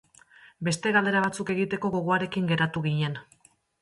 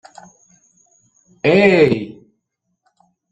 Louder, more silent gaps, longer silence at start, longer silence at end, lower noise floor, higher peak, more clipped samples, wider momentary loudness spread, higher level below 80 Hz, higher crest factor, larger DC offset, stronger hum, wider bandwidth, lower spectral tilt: second, -26 LUFS vs -14 LUFS; neither; second, 0.45 s vs 1.45 s; second, 0.6 s vs 1.2 s; second, -55 dBFS vs -73 dBFS; second, -10 dBFS vs -2 dBFS; neither; second, 7 LU vs 13 LU; second, -64 dBFS vs -54 dBFS; about the same, 18 dB vs 18 dB; neither; neither; first, 11.5 kHz vs 8.8 kHz; second, -5.5 dB/octave vs -7 dB/octave